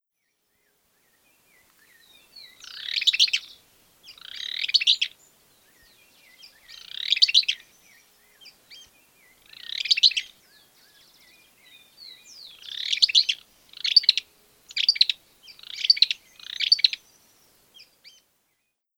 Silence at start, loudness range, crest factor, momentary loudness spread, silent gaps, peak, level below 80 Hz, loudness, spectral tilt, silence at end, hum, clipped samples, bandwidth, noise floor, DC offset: 2.35 s; 5 LU; 26 dB; 24 LU; none; -2 dBFS; -74 dBFS; -21 LUFS; 4 dB/octave; 2 s; none; under 0.1%; over 20 kHz; -76 dBFS; under 0.1%